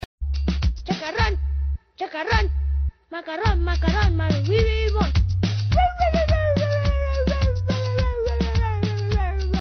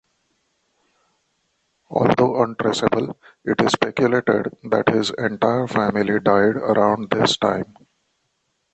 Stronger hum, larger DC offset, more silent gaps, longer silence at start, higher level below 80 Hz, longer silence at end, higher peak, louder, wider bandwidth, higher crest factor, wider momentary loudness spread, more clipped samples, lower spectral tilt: neither; neither; neither; second, 0.2 s vs 1.9 s; first, -24 dBFS vs -56 dBFS; second, 0 s vs 1.1 s; second, -6 dBFS vs -2 dBFS; second, -23 LUFS vs -19 LUFS; second, 6.6 kHz vs 8.8 kHz; about the same, 14 dB vs 18 dB; about the same, 7 LU vs 7 LU; neither; about the same, -5.5 dB/octave vs -5.5 dB/octave